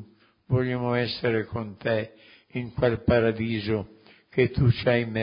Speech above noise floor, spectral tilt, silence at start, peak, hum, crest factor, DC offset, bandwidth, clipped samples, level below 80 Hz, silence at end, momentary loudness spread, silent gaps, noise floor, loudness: 25 dB; -11.5 dB/octave; 0 s; -8 dBFS; none; 18 dB; under 0.1%; 5.4 kHz; under 0.1%; -46 dBFS; 0 s; 12 LU; none; -50 dBFS; -26 LUFS